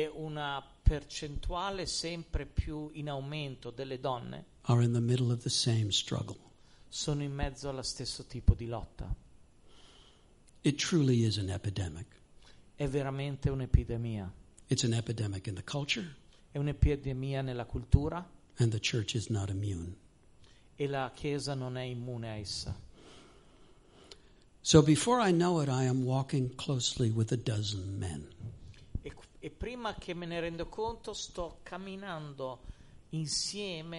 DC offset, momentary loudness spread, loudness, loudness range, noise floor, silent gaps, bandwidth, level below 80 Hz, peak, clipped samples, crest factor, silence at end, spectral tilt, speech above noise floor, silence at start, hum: under 0.1%; 15 LU; -34 LUFS; 10 LU; -61 dBFS; none; 11.5 kHz; -42 dBFS; -8 dBFS; under 0.1%; 26 dB; 0 s; -5 dB/octave; 28 dB; 0 s; none